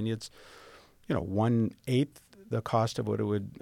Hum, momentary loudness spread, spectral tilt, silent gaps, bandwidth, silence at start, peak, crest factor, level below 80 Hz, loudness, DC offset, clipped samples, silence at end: none; 9 LU; -7 dB/octave; none; 15 kHz; 0 s; -14 dBFS; 18 dB; -60 dBFS; -31 LUFS; under 0.1%; under 0.1%; 0.05 s